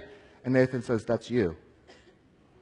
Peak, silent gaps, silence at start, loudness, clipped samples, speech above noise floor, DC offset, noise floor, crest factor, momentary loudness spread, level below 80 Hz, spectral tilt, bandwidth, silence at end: -10 dBFS; none; 0 s; -28 LUFS; under 0.1%; 33 dB; under 0.1%; -60 dBFS; 20 dB; 18 LU; -60 dBFS; -7.5 dB/octave; 10.5 kHz; 1.05 s